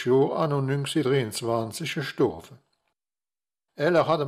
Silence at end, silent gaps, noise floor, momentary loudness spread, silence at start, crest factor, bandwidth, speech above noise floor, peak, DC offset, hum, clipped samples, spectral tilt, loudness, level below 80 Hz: 0 s; none; under -90 dBFS; 8 LU; 0 s; 18 dB; 15 kHz; over 65 dB; -8 dBFS; under 0.1%; none; under 0.1%; -6 dB/octave; -25 LUFS; -66 dBFS